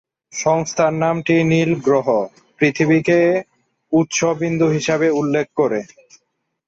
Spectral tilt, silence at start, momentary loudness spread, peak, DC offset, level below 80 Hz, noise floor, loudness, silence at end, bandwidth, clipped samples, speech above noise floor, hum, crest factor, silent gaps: -5.5 dB/octave; 0.35 s; 6 LU; -4 dBFS; under 0.1%; -56 dBFS; -70 dBFS; -17 LUFS; 0.85 s; 7.8 kHz; under 0.1%; 53 dB; none; 14 dB; none